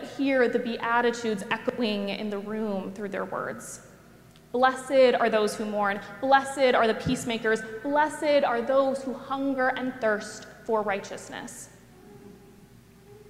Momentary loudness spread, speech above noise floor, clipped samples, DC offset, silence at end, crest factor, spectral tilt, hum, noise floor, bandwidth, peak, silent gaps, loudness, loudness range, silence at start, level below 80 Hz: 15 LU; 27 dB; under 0.1%; under 0.1%; 0 s; 20 dB; -4.5 dB/octave; none; -53 dBFS; 15.5 kHz; -8 dBFS; none; -26 LUFS; 7 LU; 0 s; -62 dBFS